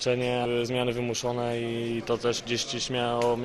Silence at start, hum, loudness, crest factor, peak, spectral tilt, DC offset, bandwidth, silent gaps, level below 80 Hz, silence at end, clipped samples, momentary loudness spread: 0 s; none; -28 LUFS; 16 dB; -12 dBFS; -4.5 dB/octave; under 0.1%; 12.5 kHz; none; -54 dBFS; 0 s; under 0.1%; 3 LU